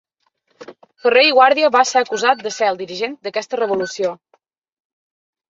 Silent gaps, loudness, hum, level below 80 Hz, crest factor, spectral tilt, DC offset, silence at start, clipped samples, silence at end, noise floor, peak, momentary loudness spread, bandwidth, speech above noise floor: none; -16 LUFS; none; -70 dBFS; 18 dB; -2 dB/octave; under 0.1%; 0.6 s; under 0.1%; 1.35 s; -67 dBFS; -2 dBFS; 12 LU; 7.8 kHz; 50 dB